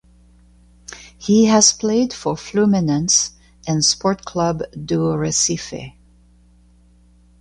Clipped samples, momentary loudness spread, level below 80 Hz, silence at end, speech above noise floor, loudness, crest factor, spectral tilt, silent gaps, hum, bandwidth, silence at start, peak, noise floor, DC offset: under 0.1%; 20 LU; -48 dBFS; 1.5 s; 34 dB; -17 LUFS; 20 dB; -3.5 dB/octave; none; 60 Hz at -45 dBFS; 11.5 kHz; 0.9 s; 0 dBFS; -51 dBFS; under 0.1%